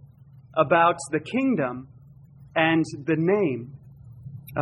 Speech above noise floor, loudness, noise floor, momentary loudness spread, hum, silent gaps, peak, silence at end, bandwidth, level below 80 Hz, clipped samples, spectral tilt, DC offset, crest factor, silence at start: 27 dB; -24 LUFS; -50 dBFS; 21 LU; none; none; -6 dBFS; 0 s; 14 kHz; -60 dBFS; under 0.1%; -6 dB/octave; under 0.1%; 20 dB; 0.35 s